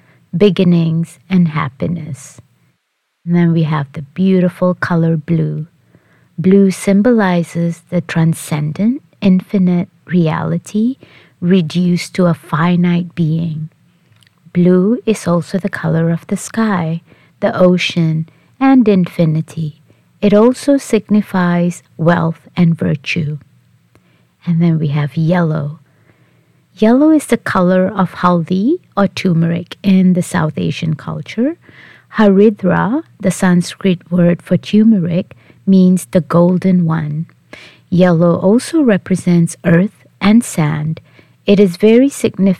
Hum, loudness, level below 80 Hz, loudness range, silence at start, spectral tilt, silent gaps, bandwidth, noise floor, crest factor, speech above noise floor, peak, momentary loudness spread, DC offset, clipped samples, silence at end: none; -14 LUFS; -50 dBFS; 4 LU; 0.35 s; -7 dB/octave; none; 13 kHz; -67 dBFS; 14 dB; 55 dB; 0 dBFS; 11 LU; 0.1%; under 0.1%; 0.05 s